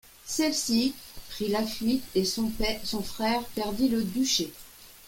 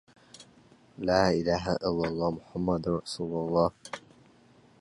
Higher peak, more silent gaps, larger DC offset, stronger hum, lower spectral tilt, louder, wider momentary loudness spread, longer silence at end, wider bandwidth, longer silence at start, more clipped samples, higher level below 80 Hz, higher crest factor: about the same, -12 dBFS vs -10 dBFS; neither; neither; neither; second, -3.5 dB/octave vs -6 dB/octave; about the same, -28 LUFS vs -29 LUFS; about the same, 10 LU vs 10 LU; second, 0 s vs 0.8 s; first, 17 kHz vs 11.5 kHz; second, 0.05 s vs 0.4 s; neither; first, -46 dBFS vs -52 dBFS; second, 16 dB vs 22 dB